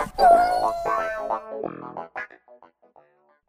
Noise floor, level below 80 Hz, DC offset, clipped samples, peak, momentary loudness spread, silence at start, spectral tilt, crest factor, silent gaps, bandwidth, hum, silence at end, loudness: -59 dBFS; -50 dBFS; under 0.1%; under 0.1%; -4 dBFS; 20 LU; 0 s; -4.5 dB/octave; 20 dB; none; 15 kHz; none; 1.2 s; -22 LUFS